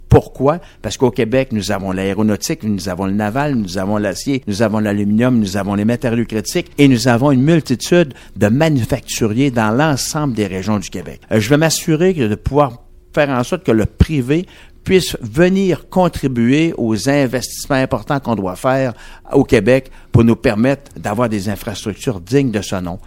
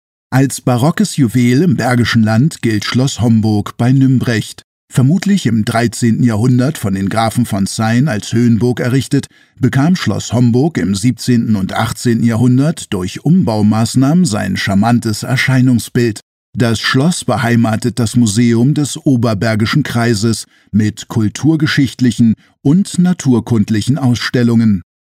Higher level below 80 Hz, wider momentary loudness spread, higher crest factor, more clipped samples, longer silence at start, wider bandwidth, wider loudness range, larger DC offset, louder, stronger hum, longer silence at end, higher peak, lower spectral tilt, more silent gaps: first, -34 dBFS vs -46 dBFS; about the same, 8 LU vs 6 LU; about the same, 16 dB vs 12 dB; first, 0.1% vs under 0.1%; second, 0 s vs 0.3 s; about the same, 17 kHz vs 15.5 kHz; about the same, 3 LU vs 1 LU; neither; second, -16 LUFS vs -13 LUFS; neither; second, 0.05 s vs 0.35 s; about the same, 0 dBFS vs 0 dBFS; about the same, -6 dB/octave vs -6 dB/octave; second, none vs 4.64-4.88 s, 16.23-16.53 s